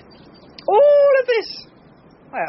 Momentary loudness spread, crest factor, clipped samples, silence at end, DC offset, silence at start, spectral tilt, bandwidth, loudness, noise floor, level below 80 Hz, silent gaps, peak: 20 LU; 14 dB; under 0.1%; 0 s; under 0.1%; 0.7 s; -1 dB/octave; 6 kHz; -15 LUFS; -48 dBFS; -62 dBFS; none; -4 dBFS